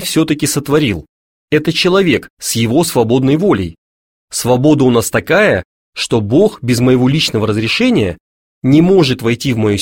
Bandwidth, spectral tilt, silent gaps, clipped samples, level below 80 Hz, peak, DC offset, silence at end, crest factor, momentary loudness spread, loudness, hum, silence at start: 17 kHz; -5 dB/octave; 1.09-1.48 s, 2.30-2.37 s, 3.78-4.28 s, 5.65-5.93 s, 8.20-8.61 s; under 0.1%; -42 dBFS; 0 dBFS; under 0.1%; 0 s; 12 dB; 8 LU; -13 LUFS; none; 0 s